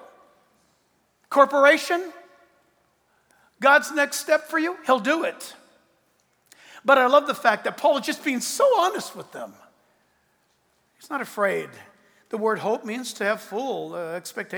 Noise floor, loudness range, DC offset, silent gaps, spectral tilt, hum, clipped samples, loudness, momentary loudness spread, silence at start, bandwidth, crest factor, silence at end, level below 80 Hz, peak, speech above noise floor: -67 dBFS; 8 LU; under 0.1%; none; -3 dB/octave; none; under 0.1%; -22 LUFS; 17 LU; 1.3 s; over 20 kHz; 22 dB; 0 s; -82 dBFS; -2 dBFS; 45 dB